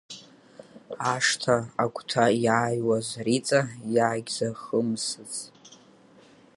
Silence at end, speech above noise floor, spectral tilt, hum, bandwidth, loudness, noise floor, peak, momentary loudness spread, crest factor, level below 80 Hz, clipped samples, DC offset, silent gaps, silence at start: 0.8 s; 29 dB; -4 dB/octave; none; 11.5 kHz; -26 LUFS; -55 dBFS; -6 dBFS; 13 LU; 22 dB; -68 dBFS; under 0.1%; under 0.1%; none; 0.1 s